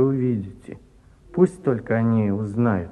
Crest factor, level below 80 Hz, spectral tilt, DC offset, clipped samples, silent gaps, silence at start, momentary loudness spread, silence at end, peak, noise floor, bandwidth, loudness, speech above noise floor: 18 dB; -52 dBFS; -10 dB/octave; under 0.1%; under 0.1%; none; 0 s; 15 LU; 0 s; -4 dBFS; -51 dBFS; 10.5 kHz; -22 LUFS; 30 dB